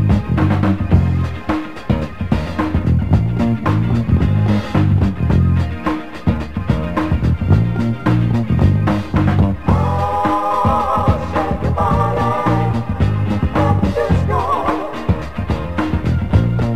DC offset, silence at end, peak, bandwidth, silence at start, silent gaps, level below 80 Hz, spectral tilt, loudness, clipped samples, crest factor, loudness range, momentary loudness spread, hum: 2%; 0 s; 0 dBFS; 8.6 kHz; 0 s; none; -26 dBFS; -8.5 dB/octave; -17 LUFS; under 0.1%; 16 dB; 2 LU; 6 LU; none